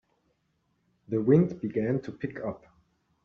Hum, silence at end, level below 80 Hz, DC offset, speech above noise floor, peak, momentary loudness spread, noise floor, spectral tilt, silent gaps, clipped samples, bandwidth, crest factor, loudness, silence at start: none; 0.65 s; -64 dBFS; under 0.1%; 47 dB; -8 dBFS; 14 LU; -74 dBFS; -10 dB/octave; none; under 0.1%; 6.4 kHz; 22 dB; -28 LUFS; 1.1 s